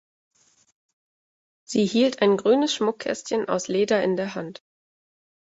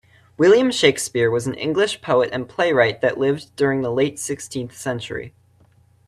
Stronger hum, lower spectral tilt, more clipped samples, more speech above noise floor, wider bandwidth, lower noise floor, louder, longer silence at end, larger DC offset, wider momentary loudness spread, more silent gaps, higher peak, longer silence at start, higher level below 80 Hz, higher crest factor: neither; about the same, -4.5 dB/octave vs -4.5 dB/octave; neither; first, over 68 dB vs 36 dB; second, 8 kHz vs 13.5 kHz; first, under -90 dBFS vs -55 dBFS; second, -23 LUFS vs -20 LUFS; first, 1.05 s vs 0.8 s; neither; second, 10 LU vs 13 LU; neither; second, -6 dBFS vs 0 dBFS; first, 1.7 s vs 0.4 s; second, -68 dBFS vs -58 dBFS; about the same, 18 dB vs 20 dB